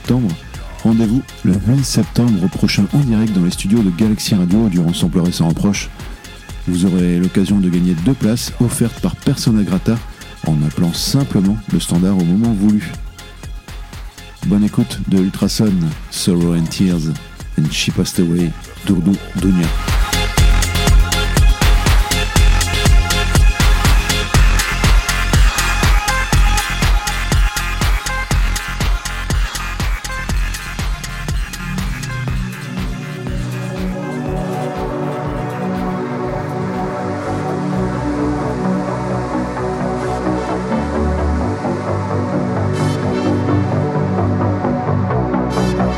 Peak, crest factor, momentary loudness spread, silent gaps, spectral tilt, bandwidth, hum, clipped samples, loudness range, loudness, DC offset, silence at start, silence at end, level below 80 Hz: 0 dBFS; 14 dB; 9 LU; none; -5.5 dB/octave; 17 kHz; none; under 0.1%; 7 LU; -17 LUFS; under 0.1%; 0 s; 0 s; -20 dBFS